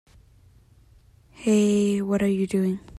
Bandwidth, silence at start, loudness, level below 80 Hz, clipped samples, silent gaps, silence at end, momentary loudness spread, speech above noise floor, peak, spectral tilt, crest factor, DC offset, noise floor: 13 kHz; 1.4 s; -23 LUFS; -54 dBFS; under 0.1%; none; 0 s; 5 LU; 33 dB; -10 dBFS; -6.5 dB/octave; 14 dB; under 0.1%; -55 dBFS